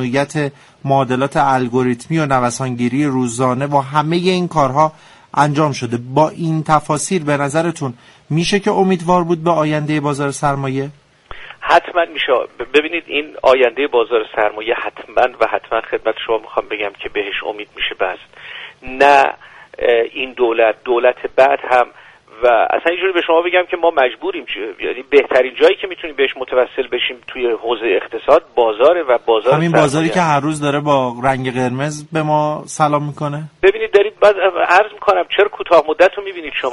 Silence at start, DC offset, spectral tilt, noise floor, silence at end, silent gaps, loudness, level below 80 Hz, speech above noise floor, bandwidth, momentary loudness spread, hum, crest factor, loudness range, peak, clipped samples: 0 s; under 0.1%; -5.5 dB/octave; -35 dBFS; 0 s; none; -16 LUFS; -50 dBFS; 19 dB; 11.5 kHz; 10 LU; none; 16 dB; 3 LU; 0 dBFS; under 0.1%